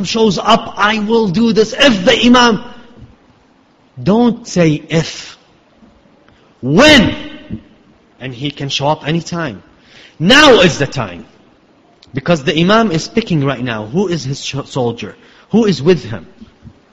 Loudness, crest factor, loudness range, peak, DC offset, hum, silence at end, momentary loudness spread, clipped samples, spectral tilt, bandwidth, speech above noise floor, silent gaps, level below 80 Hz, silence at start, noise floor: -12 LUFS; 14 dB; 6 LU; 0 dBFS; under 0.1%; none; 0.25 s; 20 LU; 0.2%; -5 dB/octave; 12.5 kHz; 38 dB; none; -42 dBFS; 0 s; -50 dBFS